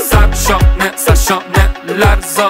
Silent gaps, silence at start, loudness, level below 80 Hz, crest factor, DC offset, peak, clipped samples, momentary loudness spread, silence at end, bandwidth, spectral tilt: none; 0 s; -12 LUFS; -14 dBFS; 10 dB; under 0.1%; 0 dBFS; under 0.1%; 2 LU; 0 s; 16.5 kHz; -4.5 dB/octave